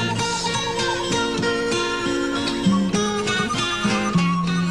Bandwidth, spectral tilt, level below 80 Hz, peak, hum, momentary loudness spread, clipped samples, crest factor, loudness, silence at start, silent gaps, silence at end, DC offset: 12.5 kHz; -4.5 dB/octave; -44 dBFS; -8 dBFS; none; 2 LU; under 0.1%; 14 dB; -21 LUFS; 0 s; none; 0 s; under 0.1%